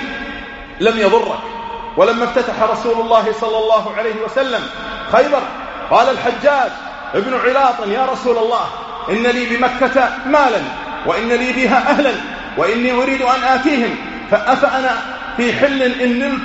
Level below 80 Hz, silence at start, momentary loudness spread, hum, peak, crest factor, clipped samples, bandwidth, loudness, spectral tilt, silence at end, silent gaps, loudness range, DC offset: -44 dBFS; 0 s; 11 LU; none; 0 dBFS; 16 dB; under 0.1%; 8 kHz; -15 LUFS; -2 dB/octave; 0 s; none; 1 LU; under 0.1%